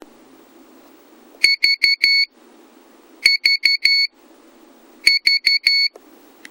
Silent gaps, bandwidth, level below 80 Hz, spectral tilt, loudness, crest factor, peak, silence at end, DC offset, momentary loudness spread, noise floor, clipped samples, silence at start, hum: none; over 20 kHz; -70 dBFS; 3 dB/octave; -14 LUFS; 20 dB; 0 dBFS; 0.6 s; under 0.1%; 4 LU; -49 dBFS; under 0.1%; 1.4 s; none